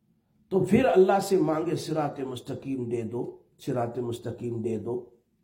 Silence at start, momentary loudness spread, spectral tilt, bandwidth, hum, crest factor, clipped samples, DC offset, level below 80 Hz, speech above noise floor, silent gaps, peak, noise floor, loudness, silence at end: 0.5 s; 14 LU; -7 dB/octave; 16.5 kHz; none; 18 dB; under 0.1%; under 0.1%; -62 dBFS; 40 dB; none; -8 dBFS; -67 dBFS; -27 LUFS; 0.4 s